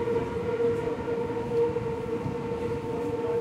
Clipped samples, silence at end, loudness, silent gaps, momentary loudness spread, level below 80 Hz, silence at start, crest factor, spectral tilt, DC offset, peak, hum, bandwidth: under 0.1%; 0 s; -29 LUFS; none; 4 LU; -50 dBFS; 0 s; 14 dB; -7.5 dB/octave; under 0.1%; -16 dBFS; none; 11 kHz